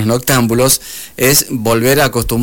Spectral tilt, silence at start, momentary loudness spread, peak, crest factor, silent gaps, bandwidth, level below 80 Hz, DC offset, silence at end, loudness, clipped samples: -4 dB/octave; 0 s; 4 LU; 0 dBFS; 12 dB; none; 17 kHz; -32 dBFS; 0.8%; 0 s; -12 LUFS; under 0.1%